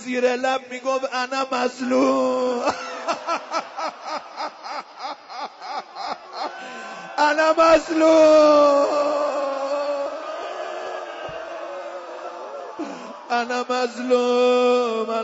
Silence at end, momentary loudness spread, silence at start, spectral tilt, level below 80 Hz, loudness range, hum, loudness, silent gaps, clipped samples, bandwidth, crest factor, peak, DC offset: 0 s; 17 LU; 0 s; -3 dB/octave; -60 dBFS; 14 LU; none; -21 LUFS; none; under 0.1%; 8 kHz; 16 dB; -6 dBFS; under 0.1%